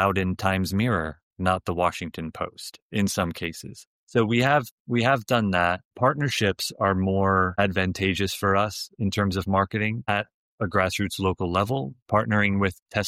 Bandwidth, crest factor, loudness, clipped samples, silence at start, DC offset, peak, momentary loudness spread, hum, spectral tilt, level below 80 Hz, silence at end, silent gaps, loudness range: 15.5 kHz; 18 dB; -25 LUFS; under 0.1%; 0 s; under 0.1%; -8 dBFS; 11 LU; none; -5.5 dB/octave; -52 dBFS; 0 s; 1.23-1.31 s, 2.82-2.90 s, 3.87-4.07 s, 4.71-4.85 s, 5.85-5.91 s, 10.34-10.58 s, 12.02-12.06 s, 12.82-12.86 s; 4 LU